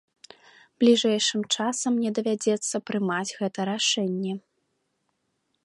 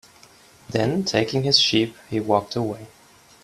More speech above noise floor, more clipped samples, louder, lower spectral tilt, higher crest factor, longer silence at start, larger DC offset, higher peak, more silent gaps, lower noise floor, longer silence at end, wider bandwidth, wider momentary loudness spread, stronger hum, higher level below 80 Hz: first, 51 dB vs 29 dB; neither; second, -25 LUFS vs -21 LUFS; about the same, -3.5 dB/octave vs -4.5 dB/octave; about the same, 18 dB vs 20 dB; about the same, 0.8 s vs 0.7 s; neither; second, -8 dBFS vs -4 dBFS; neither; first, -75 dBFS vs -51 dBFS; first, 1.25 s vs 0.55 s; second, 11.5 kHz vs 14 kHz; second, 9 LU vs 12 LU; neither; second, -76 dBFS vs -58 dBFS